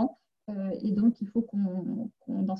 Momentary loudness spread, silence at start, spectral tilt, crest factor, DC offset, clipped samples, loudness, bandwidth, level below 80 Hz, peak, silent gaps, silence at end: 11 LU; 0 s; -11 dB/octave; 16 dB; under 0.1%; under 0.1%; -30 LUFS; 5.6 kHz; -68 dBFS; -14 dBFS; none; 0 s